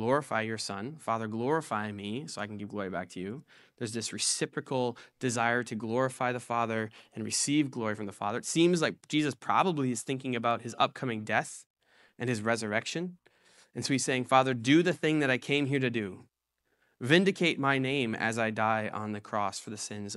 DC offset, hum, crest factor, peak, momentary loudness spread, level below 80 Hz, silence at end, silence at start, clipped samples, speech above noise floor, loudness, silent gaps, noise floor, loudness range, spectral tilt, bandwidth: under 0.1%; none; 22 dB; -8 dBFS; 12 LU; -76 dBFS; 0 s; 0 s; under 0.1%; 49 dB; -30 LUFS; 11.66-11.74 s; -79 dBFS; 6 LU; -4 dB/octave; 13.5 kHz